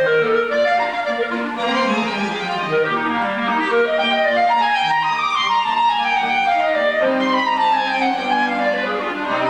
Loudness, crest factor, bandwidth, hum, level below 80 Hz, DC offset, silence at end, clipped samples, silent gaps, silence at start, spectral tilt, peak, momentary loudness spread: -18 LUFS; 12 dB; 11 kHz; none; -60 dBFS; 0.1%; 0 s; under 0.1%; none; 0 s; -4 dB/octave; -6 dBFS; 5 LU